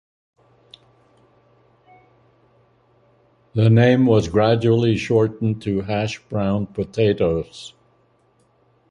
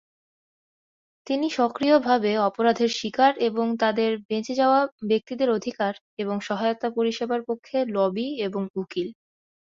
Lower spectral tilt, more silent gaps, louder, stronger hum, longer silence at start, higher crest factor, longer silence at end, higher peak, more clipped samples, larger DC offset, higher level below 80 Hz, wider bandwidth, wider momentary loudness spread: first, -7.5 dB/octave vs -5 dB/octave; second, none vs 4.25-4.29 s, 4.92-4.98 s, 6.01-6.17 s, 8.70-8.74 s; first, -19 LUFS vs -24 LUFS; neither; first, 3.55 s vs 1.25 s; about the same, 18 dB vs 18 dB; first, 1.2 s vs 0.6 s; first, -2 dBFS vs -6 dBFS; neither; neither; first, -46 dBFS vs -70 dBFS; first, 9.4 kHz vs 7.6 kHz; first, 12 LU vs 9 LU